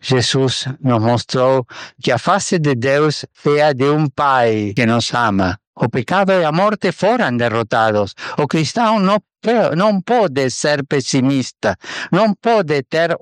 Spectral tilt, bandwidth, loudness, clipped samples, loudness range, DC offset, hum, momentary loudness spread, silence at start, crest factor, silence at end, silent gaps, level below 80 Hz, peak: -5.5 dB/octave; 11 kHz; -16 LUFS; under 0.1%; 1 LU; under 0.1%; none; 6 LU; 0.05 s; 14 dB; 0.05 s; 5.67-5.73 s; -56 dBFS; -2 dBFS